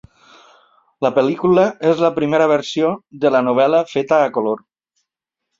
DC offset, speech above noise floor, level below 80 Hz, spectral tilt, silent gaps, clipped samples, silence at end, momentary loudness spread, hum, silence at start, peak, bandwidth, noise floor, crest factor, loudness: under 0.1%; 65 dB; -60 dBFS; -6.5 dB/octave; none; under 0.1%; 1 s; 6 LU; none; 1 s; -2 dBFS; 7.6 kHz; -80 dBFS; 16 dB; -16 LUFS